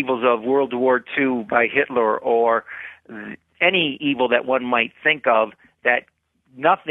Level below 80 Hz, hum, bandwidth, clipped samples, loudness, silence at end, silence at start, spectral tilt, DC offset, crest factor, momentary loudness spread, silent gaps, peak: -66 dBFS; none; 4 kHz; under 0.1%; -19 LUFS; 0 s; 0 s; -7.5 dB/octave; under 0.1%; 18 dB; 15 LU; none; -2 dBFS